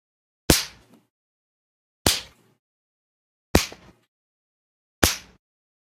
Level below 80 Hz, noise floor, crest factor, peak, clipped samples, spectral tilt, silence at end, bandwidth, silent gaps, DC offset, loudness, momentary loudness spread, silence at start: -40 dBFS; -41 dBFS; 28 dB; 0 dBFS; under 0.1%; -3 dB/octave; 0.75 s; 16.5 kHz; 1.10-2.05 s, 2.59-3.54 s, 4.08-5.02 s; under 0.1%; -23 LUFS; 13 LU; 0.5 s